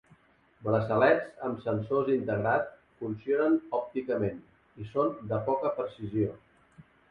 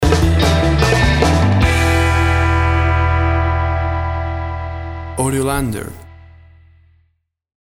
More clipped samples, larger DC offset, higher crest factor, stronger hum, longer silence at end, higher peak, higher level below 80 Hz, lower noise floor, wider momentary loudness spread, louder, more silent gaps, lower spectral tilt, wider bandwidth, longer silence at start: neither; neither; first, 20 dB vs 14 dB; neither; second, 0.3 s vs 1.55 s; second, -10 dBFS vs 0 dBFS; second, -62 dBFS vs -22 dBFS; about the same, -62 dBFS vs -64 dBFS; about the same, 12 LU vs 11 LU; second, -30 LUFS vs -16 LUFS; neither; first, -9.5 dB/octave vs -5.5 dB/octave; second, 5.2 kHz vs 14 kHz; first, 0.6 s vs 0 s